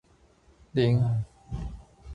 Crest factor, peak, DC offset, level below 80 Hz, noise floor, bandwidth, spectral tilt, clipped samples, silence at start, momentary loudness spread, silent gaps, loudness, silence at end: 16 dB; -12 dBFS; under 0.1%; -46 dBFS; -60 dBFS; 7.4 kHz; -8.5 dB/octave; under 0.1%; 0.75 s; 17 LU; none; -28 LUFS; 0 s